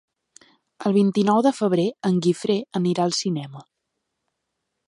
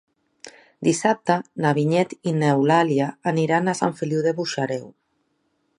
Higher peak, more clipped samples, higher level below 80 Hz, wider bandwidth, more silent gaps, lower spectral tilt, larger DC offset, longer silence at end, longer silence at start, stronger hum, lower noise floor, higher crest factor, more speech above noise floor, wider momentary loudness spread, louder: second, -8 dBFS vs -4 dBFS; neither; about the same, -70 dBFS vs -70 dBFS; about the same, 11.5 kHz vs 11.5 kHz; neither; about the same, -6 dB/octave vs -6 dB/octave; neither; first, 1.25 s vs 0.9 s; first, 0.8 s vs 0.45 s; neither; first, -79 dBFS vs -70 dBFS; about the same, 16 dB vs 18 dB; first, 58 dB vs 49 dB; about the same, 9 LU vs 7 LU; about the same, -22 LUFS vs -22 LUFS